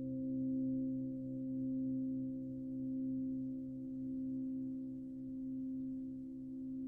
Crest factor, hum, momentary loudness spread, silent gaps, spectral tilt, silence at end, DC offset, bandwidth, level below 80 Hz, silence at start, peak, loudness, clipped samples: 10 dB; none; 7 LU; none; -12.5 dB/octave; 0 s; under 0.1%; 0.8 kHz; -68 dBFS; 0 s; -32 dBFS; -42 LUFS; under 0.1%